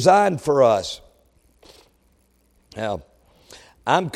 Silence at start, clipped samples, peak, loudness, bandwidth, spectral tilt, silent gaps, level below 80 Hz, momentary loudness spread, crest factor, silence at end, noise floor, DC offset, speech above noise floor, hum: 0 s; under 0.1%; -2 dBFS; -21 LUFS; 14 kHz; -5 dB/octave; none; -56 dBFS; 17 LU; 20 dB; 0.05 s; -61 dBFS; under 0.1%; 43 dB; none